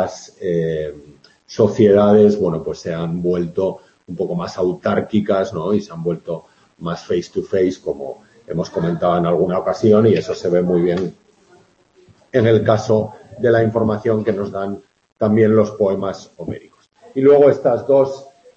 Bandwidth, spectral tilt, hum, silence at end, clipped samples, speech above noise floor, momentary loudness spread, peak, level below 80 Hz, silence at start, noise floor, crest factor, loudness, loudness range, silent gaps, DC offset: 7.6 kHz; -7.5 dB/octave; none; 0.25 s; under 0.1%; 37 dB; 16 LU; 0 dBFS; -52 dBFS; 0 s; -53 dBFS; 16 dB; -17 LUFS; 5 LU; 15.12-15.16 s; under 0.1%